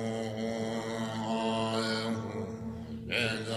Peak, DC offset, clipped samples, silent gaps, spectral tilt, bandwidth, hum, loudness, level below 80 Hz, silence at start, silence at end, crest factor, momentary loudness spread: -16 dBFS; under 0.1%; under 0.1%; none; -5 dB/octave; 13.5 kHz; none; -33 LUFS; -60 dBFS; 0 s; 0 s; 18 dB; 8 LU